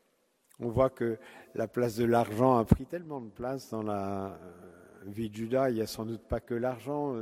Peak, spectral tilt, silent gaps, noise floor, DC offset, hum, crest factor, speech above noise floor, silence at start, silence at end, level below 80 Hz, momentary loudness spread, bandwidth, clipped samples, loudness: -6 dBFS; -7.5 dB/octave; none; -72 dBFS; under 0.1%; none; 26 dB; 41 dB; 0.6 s; 0 s; -50 dBFS; 16 LU; 16 kHz; under 0.1%; -31 LUFS